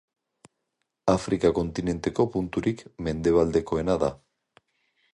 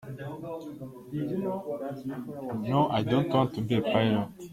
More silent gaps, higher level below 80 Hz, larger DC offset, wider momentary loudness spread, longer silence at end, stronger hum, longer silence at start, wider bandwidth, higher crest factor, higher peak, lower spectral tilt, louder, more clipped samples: neither; first, -46 dBFS vs -62 dBFS; neither; second, 7 LU vs 14 LU; first, 0.95 s vs 0 s; neither; first, 1.05 s vs 0 s; second, 11 kHz vs 16 kHz; about the same, 20 dB vs 20 dB; first, -6 dBFS vs -10 dBFS; about the same, -7 dB/octave vs -8 dB/octave; first, -26 LUFS vs -29 LUFS; neither